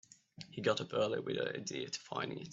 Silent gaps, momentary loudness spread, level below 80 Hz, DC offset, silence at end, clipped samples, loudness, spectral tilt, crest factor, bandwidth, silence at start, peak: none; 7 LU; -78 dBFS; under 0.1%; 0 s; under 0.1%; -38 LUFS; -4 dB/octave; 20 dB; 8 kHz; 0.4 s; -18 dBFS